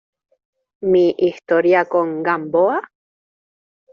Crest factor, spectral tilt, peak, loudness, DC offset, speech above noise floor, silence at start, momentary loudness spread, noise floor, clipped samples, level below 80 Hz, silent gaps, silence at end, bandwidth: 16 dB; -5 dB/octave; -4 dBFS; -17 LUFS; under 0.1%; over 74 dB; 0.8 s; 6 LU; under -90 dBFS; under 0.1%; -64 dBFS; none; 1.1 s; 6.6 kHz